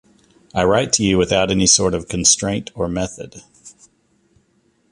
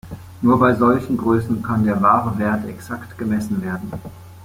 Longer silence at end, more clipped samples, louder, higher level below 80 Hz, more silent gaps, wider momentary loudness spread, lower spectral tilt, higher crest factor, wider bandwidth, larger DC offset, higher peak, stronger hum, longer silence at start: first, 1.2 s vs 0 s; neither; first, -16 LUFS vs -19 LUFS; first, -40 dBFS vs -48 dBFS; neither; second, 13 LU vs 16 LU; second, -3 dB/octave vs -8 dB/octave; about the same, 20 dB vs 18 dB; second, 11.5 kHz vs 16 kHz; neither; about the same, 0 dBFS vs -2 dBFS; neither; first, 0.55 s vs 0.05 s